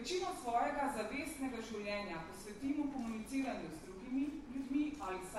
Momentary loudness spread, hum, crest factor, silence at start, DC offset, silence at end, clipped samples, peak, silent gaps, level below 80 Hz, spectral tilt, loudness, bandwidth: 8 LU; none; 16 dB; 0 s; under 0.1%; 0 s; under 0.1%; -24 dBFS; none; -62 dBFS; -4.5 dB/octave; -41 LUFS; 13.5 kHz